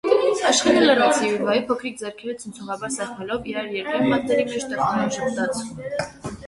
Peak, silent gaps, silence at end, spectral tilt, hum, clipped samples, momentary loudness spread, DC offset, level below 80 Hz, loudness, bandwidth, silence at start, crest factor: -4 dBFS; none; 0 s; -3.5 dB/octave; none; under 0.1%; 15 LU; under 0.1%; -56 dBFS; -22 LUFS; 11.5 kHz; 0.05 s; 18 dB